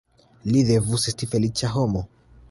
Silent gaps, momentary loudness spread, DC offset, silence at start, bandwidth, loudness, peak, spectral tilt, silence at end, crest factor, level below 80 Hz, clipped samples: none; 11 LU; under 0.1%; 0.45 s; 11.5 kHz; -22 LUFS; -8 dBFS; -5.5 dB/octave; 0.45 s; 16 dB; -46 dBFS; under 0.1%